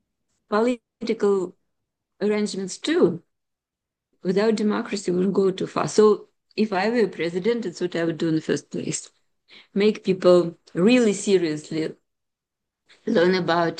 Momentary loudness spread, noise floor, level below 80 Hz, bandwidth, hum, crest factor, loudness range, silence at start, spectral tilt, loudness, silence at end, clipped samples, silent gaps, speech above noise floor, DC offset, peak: 11 LU; -86 dBFS; -70 dBFS; 10 kHz; none; 18 dB; 4 LU; 0.5 s; -5.5 dB/octave; -23 LUFS; 0 s; under 0.1%; none; 64 dB; under 0.1%; -6 dBFS